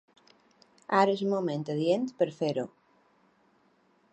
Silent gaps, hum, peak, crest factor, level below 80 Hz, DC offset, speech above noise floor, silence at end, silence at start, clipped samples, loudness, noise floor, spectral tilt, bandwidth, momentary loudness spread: none; none; -8 dBFS; 22 dB; -80 dBFS; under 0.1%; 39 dB; 1.45 s; 0.9 s; under 0.1%; -29 LUFS; -67 dBFS; -6.5 dB/octave; 8.8 kHz; 10 LU